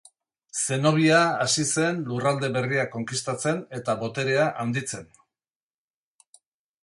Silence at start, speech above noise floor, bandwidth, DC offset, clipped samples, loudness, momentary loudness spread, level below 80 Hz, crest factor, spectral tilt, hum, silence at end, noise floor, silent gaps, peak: 0.55 s; over 66 dB; 11.5 kHz; under 0.1%; under 0.1%; -24 LUFS; 10 LU; -66 dBFS; 20 dB; -4 dB/octave; none; 1.8 s; under -90 dBFS; none; -6 dBFS